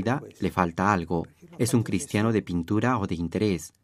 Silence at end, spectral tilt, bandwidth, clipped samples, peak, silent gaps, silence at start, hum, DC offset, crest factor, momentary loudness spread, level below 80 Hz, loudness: 0.15 s; -6 dB/octave; 15.5 kHz; under 0.1%; -4 dBFS; none; 0 s; none; under 0.1%; 22 dB; 5 LU; -54 dBFS; -26 LUFS